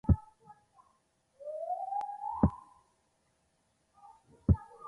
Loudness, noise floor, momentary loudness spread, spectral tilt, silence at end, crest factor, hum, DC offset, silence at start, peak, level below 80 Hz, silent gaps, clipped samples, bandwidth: -34 LUFS; -75 dBFS; 13 LU; -11 dB/octave; 0 s; 24 dB; none; under 0.1%; 0.05 s; -12 dBFS; -42 dBFS; none; under 0.1%; 2.7 kHz